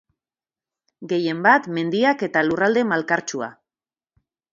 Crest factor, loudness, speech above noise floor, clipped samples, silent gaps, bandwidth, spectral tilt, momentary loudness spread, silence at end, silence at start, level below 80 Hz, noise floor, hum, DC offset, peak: 22 dB; -20 LUFS; over 70 dB; under 0.1%; none; 7.6 kHz; -5 dB/octave; 11 LU; 1 s; 1 s; -68 dBFS; under -90 dBFS; none; under 0.1%; -2 dBFS